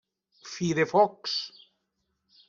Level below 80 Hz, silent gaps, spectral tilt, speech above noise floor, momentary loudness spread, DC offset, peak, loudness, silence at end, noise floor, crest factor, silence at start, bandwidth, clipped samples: -68 dBFS; none; -4.5 dB/octave; 52 dB; 16 LU; under 0.1%; -10 dBFS; -26 LUFS; 1 s; -79 dBFS; 20 dB; 0.45 s; 7.6 kHz; under 0.1%